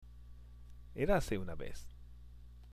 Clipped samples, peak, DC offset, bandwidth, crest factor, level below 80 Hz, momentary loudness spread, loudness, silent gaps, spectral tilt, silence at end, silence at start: under 0.1%; -18 dBFS; under 0.1%; 15 kHz; 22 dB; -48 dBFS; 24 LU; -37 LUFS; none; -6 dB/octave; 0 s; 0 s